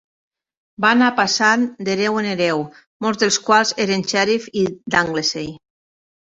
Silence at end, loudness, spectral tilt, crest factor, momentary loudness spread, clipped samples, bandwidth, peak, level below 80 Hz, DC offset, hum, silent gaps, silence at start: 0.75 s; -18 LUFS; -3 dB/octave; 18 dB; 9 LU; under 0.1%; 8 kHz; -2 dBFS; -58 dBFS; under 0.1%; none; 2.87-3.00 s; 0.8 s